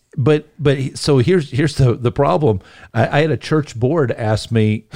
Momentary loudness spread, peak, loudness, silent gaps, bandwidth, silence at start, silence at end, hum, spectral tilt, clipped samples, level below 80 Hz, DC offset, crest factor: 4 LU; -2 dBFS; -17 LUFS; none; 11 kHz; 0.15 s; 0.15 s; none; -7 dB/octave; under 0.1%; -40 dBFS; 0.5%; 14 dB